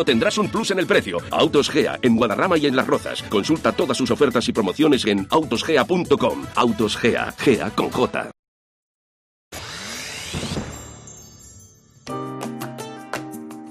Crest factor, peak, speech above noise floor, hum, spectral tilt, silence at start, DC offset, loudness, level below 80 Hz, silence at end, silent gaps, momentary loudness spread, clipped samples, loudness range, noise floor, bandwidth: 16 dB; -4 dBFS; 29 dB; none; -4.5 dB/octave; 0 s; under 0.1%; -20 LUFS; -50 dBFS; 0 s; 8.39-9.51 s; 15 LU; under 0.1%; 13 LU; -49 dBFS; 15.5 kHz